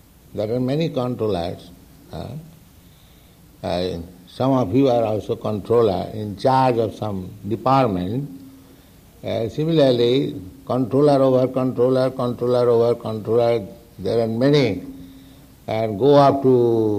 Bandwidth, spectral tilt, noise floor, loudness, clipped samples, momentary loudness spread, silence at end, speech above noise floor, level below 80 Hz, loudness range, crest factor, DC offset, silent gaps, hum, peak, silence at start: 15.5 kHz; -8 dB/octave; -49 dBFS; -20 LUFS; under 0.1%; 17 LU; 0 s; 30 dB; -54 dBFS; 8 LU; 16 dB; under 0.1%; none; none; -4 dBFS; 0.35 s